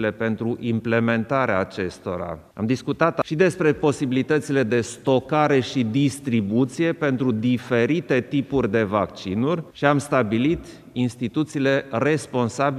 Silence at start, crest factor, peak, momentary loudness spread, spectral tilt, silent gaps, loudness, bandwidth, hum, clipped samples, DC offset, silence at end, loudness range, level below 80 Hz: 0 s; 20 dB; -2 dBFS; 6 LU; -6.5 dB/octave; none; -22 LUFS; 13.5 kHz; none; under 0.1%; under 0.1%; 0 s; 2 LU; -54 dBFS